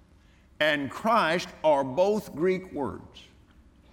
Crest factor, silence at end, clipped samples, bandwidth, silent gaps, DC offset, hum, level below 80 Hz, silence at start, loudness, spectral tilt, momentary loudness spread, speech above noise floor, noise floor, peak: 18 dB; 0.7 s; under 0.1%; 18 kHz; none; under 0.1%; none; -60 dBFS; 0.6 s; -26 LUFS; -5 dB/octave; 10 LU; 31 dB; -57 dBFS; -10 dBFS